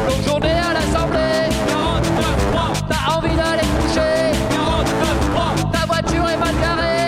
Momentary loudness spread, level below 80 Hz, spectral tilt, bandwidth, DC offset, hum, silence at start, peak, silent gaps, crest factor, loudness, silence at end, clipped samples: 1 LU; -26 dBFS; -5 dB/octave; 16 kHz; under 0.1%; none; 0 s; -8 dBFS; none; 10 dB; -18 LUFS; 0 s; under 0.1%